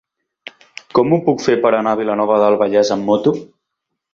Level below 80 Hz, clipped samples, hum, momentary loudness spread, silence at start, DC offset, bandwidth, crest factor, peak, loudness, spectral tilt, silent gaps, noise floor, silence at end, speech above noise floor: -58 dBFS; under 0.1%; none; 6 LU; 0.95 s; under 0.1%; 7.6 kHz; 16 dB; 0 dBFS; -15 LUFS; -6 dB/octave; none; -77 dBFS; 0.7 s; 63 dB